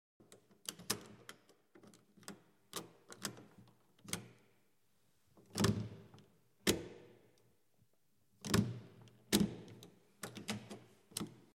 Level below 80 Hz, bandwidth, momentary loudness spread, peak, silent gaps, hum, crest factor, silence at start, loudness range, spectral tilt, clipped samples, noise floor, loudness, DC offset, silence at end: -66 dBFS; 16.5 kHz; 24 LU; -14 dBFS; none; none; 30 dB; 0.3 s; 10 LU; -4 dB/octave; under 0.1%; -79 dBFS; -41 LUFS; under 0.1%; 0.25 s